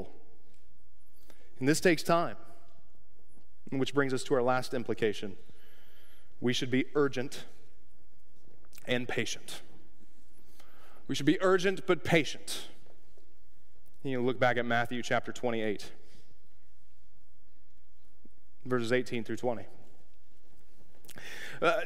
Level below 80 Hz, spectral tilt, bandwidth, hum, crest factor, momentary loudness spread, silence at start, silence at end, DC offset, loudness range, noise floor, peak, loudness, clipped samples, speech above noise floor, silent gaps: -66 dBFS; -5 dB/octave; 16 kHz; none; 24 dB; 19 LU; 0 s; 0 s; 2%; 7 LU; -66 dBFS; -10 dBFS; -31 LUFS; under 0.1%; 36 dB; none